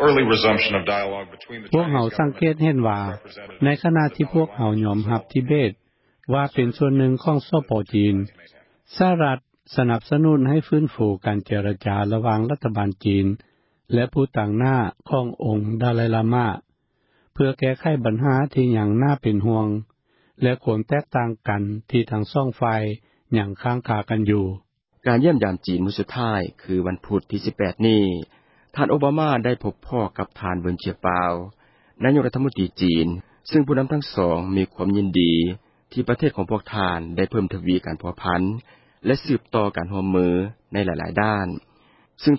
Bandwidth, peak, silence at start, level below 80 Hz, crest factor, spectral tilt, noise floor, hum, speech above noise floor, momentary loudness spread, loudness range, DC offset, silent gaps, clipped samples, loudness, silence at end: 5.8 kHz; -4 dBFS; 0 s; -46 dBFS; 16 dB; -11.5 dB/octave; -68 dBFS; none; 47 dB; 9 LU; 3 LU; under 0.1%; none; under 0.1%; -22 LUFS; 0 s